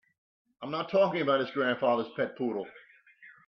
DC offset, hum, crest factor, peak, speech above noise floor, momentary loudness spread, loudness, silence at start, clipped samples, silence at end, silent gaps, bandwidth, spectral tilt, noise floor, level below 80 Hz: under 0.1%; none; 18 dB; -14 dBFS; 27 dB; 12 LU; -29 LUFS; 0.6 s; under 0.1%; 0.2 s; none; 6 kHz; -7.5 dB/octave; -56 dBFS; -78 dBFS